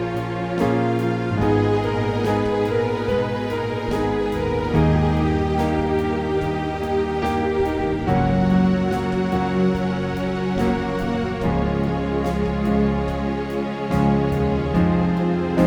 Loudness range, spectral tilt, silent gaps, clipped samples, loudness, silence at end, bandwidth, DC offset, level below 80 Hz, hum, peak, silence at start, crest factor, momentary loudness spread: 1 LU; -8 dB/octave; none; under 0.1%; -21 LUFS; 0 s; 18 kHz; under 0.1%; -34 dBFS; none; -4 dBFS; 0 s; 16 dB; 5 LU